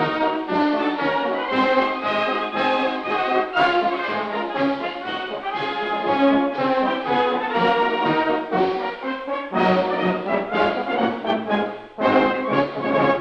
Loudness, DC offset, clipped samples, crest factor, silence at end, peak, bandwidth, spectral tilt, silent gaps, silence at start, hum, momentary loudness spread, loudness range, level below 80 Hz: -21 LUFS; under 0.1%; under 0.1%; 16 dB; 0 s; -4 dBFS; 8 kHz; -6.5 dB/octave; none; 0 s; none; 7 LU; 2 LU; -58 dBFS